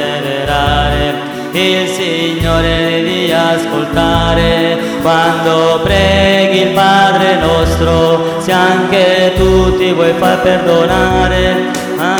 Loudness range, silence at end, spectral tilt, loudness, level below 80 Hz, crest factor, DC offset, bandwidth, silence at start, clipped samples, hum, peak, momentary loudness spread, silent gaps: 3 LU; 0 s; -5 dB/octave; -11 LUFS; -24 dBFS; 10 dB; under 0.1%; over 20 kHz; 0 s; under 0.1%; none; 0 dBFS; 5 LU; none